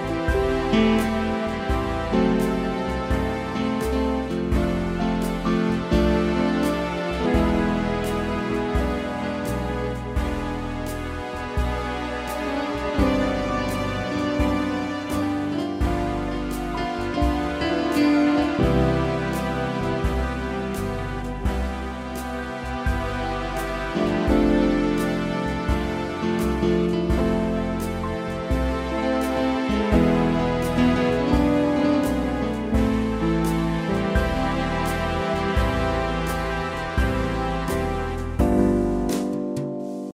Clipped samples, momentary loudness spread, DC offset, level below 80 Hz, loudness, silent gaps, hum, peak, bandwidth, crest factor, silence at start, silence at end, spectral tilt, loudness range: under 0.1%; 8 LU; under 0.1%; -32 dBFS; -24 LUFS; none; none; -6 dBFS; 16 kHz; 18 dB; 0 s; 0.05 s; -6.5 dB/octave; 5 LU